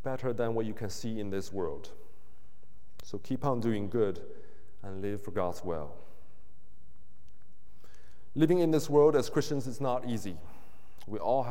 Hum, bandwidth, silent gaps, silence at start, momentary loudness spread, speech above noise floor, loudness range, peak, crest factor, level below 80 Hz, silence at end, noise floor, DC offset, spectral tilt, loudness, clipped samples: none; 16.5 kHz; none; 0.05 s; 19 LU; 33 dB; 11 LU; -14 dBFS; 20 dB; -62 dBFS; 0 s; -64 dBFS; 2%; -6.5 dB/octave; -31 LUFS; under 0.1%